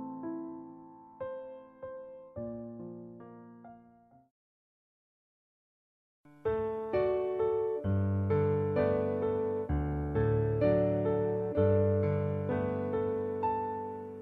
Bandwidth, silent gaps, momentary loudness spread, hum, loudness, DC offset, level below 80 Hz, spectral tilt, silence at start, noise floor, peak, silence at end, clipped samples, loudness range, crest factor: 4.5 kHz; 4.31-6.24 s; 19 LU; none; -32 LUFS; under 0.1%; -52 dBFS; -11 dB/octave; 0 s; -61 dBFS; -16 dBFS; 0 s; under 0.1%; 17 LU; 16 dB